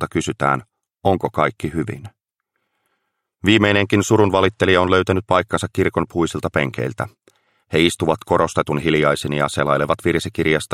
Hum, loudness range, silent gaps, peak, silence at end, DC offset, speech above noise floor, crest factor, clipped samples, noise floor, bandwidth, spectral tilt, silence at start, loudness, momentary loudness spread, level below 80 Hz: none; 4 LU; none; -2 dBFS; 0 s; under 0.1%; 57 dB; 18 dB; under 0.1%; -75 dBFS; 15.5 kHz; -5.5 dB/octave; 0 s; -18 LUFS; 9 LU; -46 dBFS